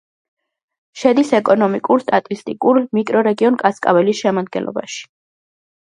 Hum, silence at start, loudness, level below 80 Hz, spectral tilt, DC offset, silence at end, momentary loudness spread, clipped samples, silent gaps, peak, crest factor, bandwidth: none; 0.95 s; -16 LUFS; -66 dBFS; -5.5 dB/octave; under 0.1%; 0.9 s; 10 LU; under 0.1%; none; 0 dBFS; 16 dB; 11 kHz